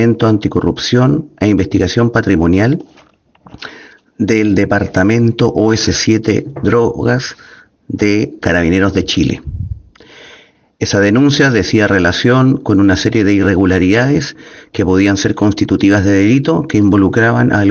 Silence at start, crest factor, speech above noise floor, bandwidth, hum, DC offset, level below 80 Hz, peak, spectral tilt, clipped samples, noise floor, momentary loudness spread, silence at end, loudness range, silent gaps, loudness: 0 s; 12 dB; 36 dB; 7.2 kHz; none; under 0.1%; -38 dBFS; 0 dBFS; -6 dB/octave; under 0.1%; -48 dBFS; 9 LU; 0 s; 4 LU; none; -12 LUFS